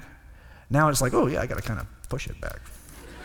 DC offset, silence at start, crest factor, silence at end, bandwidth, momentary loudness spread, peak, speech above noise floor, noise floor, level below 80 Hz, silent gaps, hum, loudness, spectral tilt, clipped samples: under 0.1%; 0 s; 20 dB; 0 s; 19.5 kHz; 23 LU; -8 dBFS; 23 dB; -48 dBFS; -40 dBFS; none; none; -26 LUFS; -5 dB/octave; under 0.1%